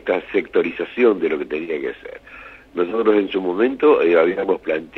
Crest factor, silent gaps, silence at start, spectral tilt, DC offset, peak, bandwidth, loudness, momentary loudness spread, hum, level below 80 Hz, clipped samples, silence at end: 16 dB; none; 0.05 s; -7.5 dB/octave; under 0.1%; -2 dBFS; 5.8 kHz; -19 LUFS; 18 LU; none; -56 dBFS; under 0.1%; 0 s